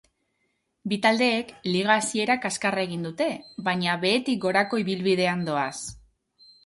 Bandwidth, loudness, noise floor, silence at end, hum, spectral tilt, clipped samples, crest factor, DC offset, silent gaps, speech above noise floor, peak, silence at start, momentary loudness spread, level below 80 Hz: 11.5 kHz; -25 LUFS; -74 dBFS; 0.7 s; none; -4 dB/octave; under 0.1%; 20 dB; under 0.1%; none; 49 dB; -6 dBFS; 0.85 s; 9 LU; -64 dBFS